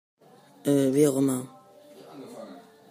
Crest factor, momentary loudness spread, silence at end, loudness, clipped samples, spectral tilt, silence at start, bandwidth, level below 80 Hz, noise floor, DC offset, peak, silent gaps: 20 dB; 23 LU; 0.3 s; -24 LUFS; under 0.1%; -6 dB/octave; 0.65 s; 15.5 kHz; -74 dBFS; -51 dBFS; under 0.1%; -8 dBFS; none